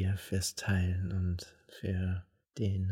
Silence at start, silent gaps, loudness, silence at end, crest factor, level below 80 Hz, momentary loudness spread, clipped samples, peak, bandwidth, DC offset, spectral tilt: 0 s; none; -35 LUFS; 0 s; 14 dB; -52 dBFS; 10 LU; under 0.1%; -20 dBFS; 16 kHz; under 0.1%; -5.5 dB/octave